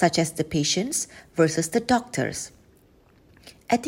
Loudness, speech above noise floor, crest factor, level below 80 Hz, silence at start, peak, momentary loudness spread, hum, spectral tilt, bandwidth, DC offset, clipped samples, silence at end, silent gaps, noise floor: -24 LUFS; 33 dB; 18 dB; -56 dBFS; 0 s; -6 dBFS; 10 LU; none; -4 dB/octave; 16 kHz; under 0.1%; under 0.1%; 0 s; none; -57 dBFS